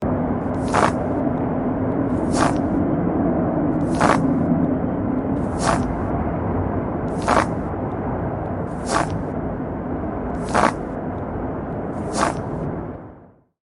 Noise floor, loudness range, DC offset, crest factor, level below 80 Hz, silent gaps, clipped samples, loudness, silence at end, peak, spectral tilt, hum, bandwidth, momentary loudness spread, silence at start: -47 dBFS; 4 LU; under 0.1%; 22 dB; -38 dBFS; none; under 0.1%; -22 LUFS; 0.4 s; 0 dBFS; -6.5 dB/octave; none; 11.5 kHz; 8 LU; 0 s